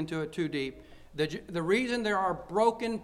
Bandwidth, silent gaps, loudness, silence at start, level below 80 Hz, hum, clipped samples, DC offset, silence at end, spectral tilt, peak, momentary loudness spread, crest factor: 14 kHz; none; -30 LUFS; 0 s; -58 dBFS; none; under 0.1%; under 0.1%; 0 s; -5.5 dB/octave; -12 dBFS; 7 LU; 18 dB